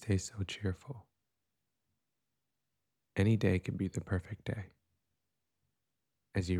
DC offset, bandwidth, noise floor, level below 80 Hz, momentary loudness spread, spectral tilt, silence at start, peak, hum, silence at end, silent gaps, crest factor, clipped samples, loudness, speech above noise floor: under 0.1%; 12 kHz; -88 dBFS; -60 dBFS; 15 LU; -6.5 dB/octave; 0 s; -16 dBFS; none; 0 s; none; 22 dB; under 0.1%; -36 LUFS; 54 dB